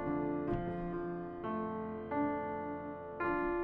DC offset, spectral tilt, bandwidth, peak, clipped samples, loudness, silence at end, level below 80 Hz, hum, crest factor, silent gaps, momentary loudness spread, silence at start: under 0.1%; -10.5 dB/octave; 4.4 kHz; -22 dBFS; under 0.1%; -38 LUFS; 0 s; -56 dBFS; none; 14 dB; none; 6 LU; 0 s